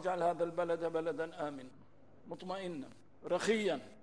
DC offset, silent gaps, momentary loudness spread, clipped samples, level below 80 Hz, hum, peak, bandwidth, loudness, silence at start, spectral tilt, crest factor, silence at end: 0.1%; none; 18 LU; under 0.1%; -76 dBFS; none; -20 dBFS; 11 kHz; -37 LUFS; 0 s; -5 dB/octave; 18 dB; 0.05 s